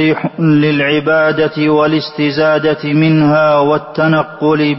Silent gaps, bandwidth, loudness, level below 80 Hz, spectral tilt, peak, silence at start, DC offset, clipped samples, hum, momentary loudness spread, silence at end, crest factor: none; 5.8 kHz; -12 LUFS; -52 dBFS; -10 dB/octave; -2 dBFS; 0 s; under 0.1%; under 0.1%; none; 4 LU; 0 s; 10 dB